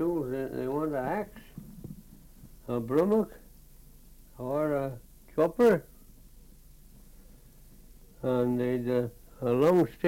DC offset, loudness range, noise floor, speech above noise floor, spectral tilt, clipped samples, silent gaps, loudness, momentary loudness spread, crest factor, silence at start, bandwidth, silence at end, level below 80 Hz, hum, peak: under 0.1%; 4 LU; -53 dBFS; 26 dB; -8 dB/octave; under 0.1%; none; -29 LUFS; 23 LU; 18 dB; 0 s; 17 kHz; 0 s; -54 dBFS; none; -12 dBFS